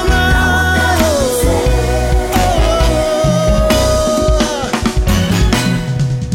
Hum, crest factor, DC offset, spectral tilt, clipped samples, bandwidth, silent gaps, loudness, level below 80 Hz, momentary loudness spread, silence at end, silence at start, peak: none; 12 dB; under 0.1%; -5 dB/octave; under 0.1%; 17 kHz; none; -13 LUFS; -18 dBFS; 4 LU; 0 s; 0 s; 0 dBFS